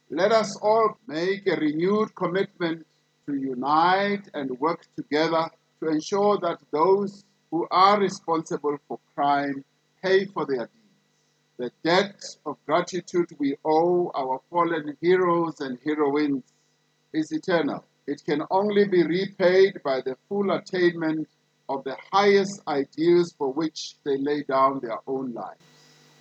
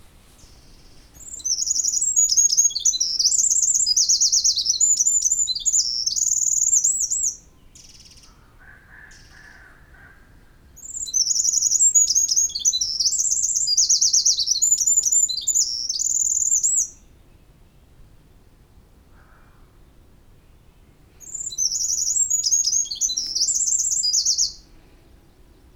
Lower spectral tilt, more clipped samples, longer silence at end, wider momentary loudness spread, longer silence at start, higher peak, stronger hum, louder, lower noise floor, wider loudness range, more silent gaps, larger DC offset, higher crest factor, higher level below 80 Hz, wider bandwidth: first, -5.5 dB/octave vs 3 dB/octave; neither; second, 0.7 s vs 1.15 s; first, 12 LU vs 7 LU; second, 0.1 s vs 0.85 s; about the same, -6 dBFS vs -6 dBFS; neither; second, -24 LUFS vs -17 LUFS; first, -68 dBFS vs -51 dBFS; second, 4 LU vs 10 LU; neither; neither; about the same, 18 dB vs 18 dB; second, -84 dBFS vs -52 dBFS; second, 8.4 kHz vs over 20 kHz